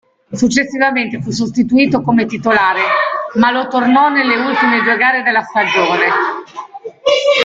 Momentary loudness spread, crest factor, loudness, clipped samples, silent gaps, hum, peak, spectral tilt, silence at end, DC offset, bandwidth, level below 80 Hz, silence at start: 8 LU; 14 dB; -13 LUFS; under 0.1%; none; none; 0 dBFS; -4.5 dB/octave; 0 s; under 0.1%; 7.8 kHz; -52 dBFS; 0.3 s